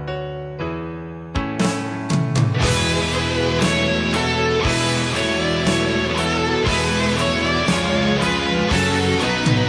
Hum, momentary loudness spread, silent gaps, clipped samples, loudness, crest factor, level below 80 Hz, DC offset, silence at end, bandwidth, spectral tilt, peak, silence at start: none; 9 LU; none; under 0.1%; -19 LUFS; 14 dB; -34 dBFS; under 0.1%; 0 s; 11 kHz; -4.5 dB/octave; -6 dBFS; 0 s